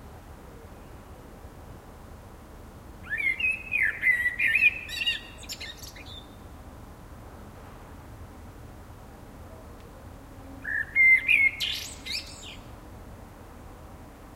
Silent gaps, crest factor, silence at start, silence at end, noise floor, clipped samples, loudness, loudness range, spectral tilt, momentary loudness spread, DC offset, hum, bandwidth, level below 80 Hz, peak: none; 22 dB; 0 s; 0 s; -46 dBFS; under 0.1%; -23 LUFS; 22 LU; -2 dB/octave; 27 LU; under 0.1%; none; 16 kHz; -50 dBFS; -8 dBFS